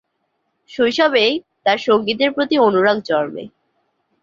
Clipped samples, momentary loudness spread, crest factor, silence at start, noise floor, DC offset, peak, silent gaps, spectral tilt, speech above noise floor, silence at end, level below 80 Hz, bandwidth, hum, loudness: under 0.1%; 7 LU; 16 dB; 0.7 s; -70 dBFS; under 0.1%; -2 dBFS; none; -5 dB/octave; 54 dB; 0.75 s; -62 dBFS; 7.6 kHz; none; -17 LUFS